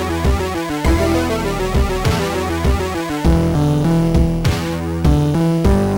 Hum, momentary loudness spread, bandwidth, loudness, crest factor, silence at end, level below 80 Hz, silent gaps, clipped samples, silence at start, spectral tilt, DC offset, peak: none; 5 LU; 18.5 kHz; -17 LUFS; 12 dB; 0 s; -22 dBFS; none; under 0.1%; 0 s; -6.5 dB/octave; under 0.1%; -4 dBFS